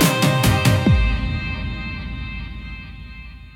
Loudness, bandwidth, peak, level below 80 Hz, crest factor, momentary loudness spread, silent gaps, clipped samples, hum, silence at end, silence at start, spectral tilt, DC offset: -20 LUFS; 17.5 kHz; -4 dBFS; -28 dBFS; 16 dB; 20 LU; none; under 0.1%; none; 0 s; 0 s; -5 dB/octave; under 0.1%